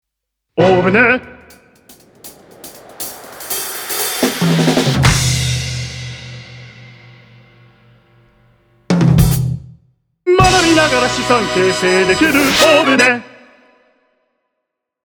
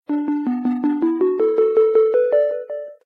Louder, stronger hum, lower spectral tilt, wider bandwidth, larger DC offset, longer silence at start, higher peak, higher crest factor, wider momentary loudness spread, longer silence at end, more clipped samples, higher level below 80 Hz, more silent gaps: first, -13 LUFS vs -18 LUFS; neither; second, -4.5 dB/octave vs -8.5 dB/octave; first, over 20 kHz vs 4.2 kHz; neither; first, 0.55 s vs 0.1 s; first, 0 dBFS vs -6 dBFS; about the same, 16 dB vs 12 dB; first, 18 LU vs 7 LU; first, 1.8 s vs 0.1 s; neither; first, -34 dBFS vs -74 dBFS; neither